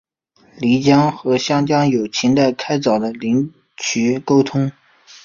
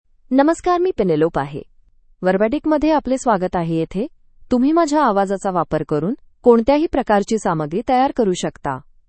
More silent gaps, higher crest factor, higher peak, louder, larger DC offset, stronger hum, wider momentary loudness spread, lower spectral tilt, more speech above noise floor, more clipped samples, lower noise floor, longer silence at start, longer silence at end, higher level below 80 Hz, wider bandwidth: neither; about the same, 16 dB vs 18 dB; about the same, -2 dBFS vs 0 dBFS; about the same, -17 LUFS vs -18 LUFS; neither; neither; about the same, 8 LU vs 9 LU; about the same, -5.5 dB/octave vs -6.5 dB/octave; first, 39 dB vs 34 dB; neither; first, -55 dBFS vs -51 dBFS; first, 0.6 s vs 0.3 s; first, 0.55 s vs 0.25 s; second, -56 dBFS vs -44 dBFS; second, 7.4 kHz vs 8.8 kHz